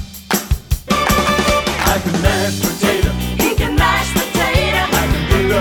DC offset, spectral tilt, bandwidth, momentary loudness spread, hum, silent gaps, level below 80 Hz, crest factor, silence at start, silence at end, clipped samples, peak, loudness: under 0.1%; -4 dB/octave; over 20 kHz; 5 LU; none; none; -24 dBFS; 16 dB; 0 s; 0 s; under 0.1%; 0 dBFS; -16 LUFS